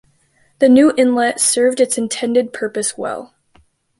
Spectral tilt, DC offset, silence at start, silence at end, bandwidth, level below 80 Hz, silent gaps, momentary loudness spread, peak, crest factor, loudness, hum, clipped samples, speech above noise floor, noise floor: -2.5 dB/octave; under 0.1%; 0.6 s; 0.75 s; 11.5 kHz; -60 dBFS; none; 12 LU; -2 dBFS; 14 dB; -15 LUFS; none; under 0.1%; 43 dB; -58 dBFS